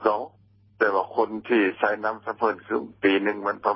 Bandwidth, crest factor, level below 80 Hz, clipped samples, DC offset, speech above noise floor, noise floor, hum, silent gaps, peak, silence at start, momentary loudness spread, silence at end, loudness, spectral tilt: 5.8 kHz; 20 dB; -68 dBFS; under 0.1%; under 0.1%; 33 dB; -57 dBFS; none; none; -6 dBFS; 0 s; 7 LU; 0 s; -25 LUFS; -9 dB/octave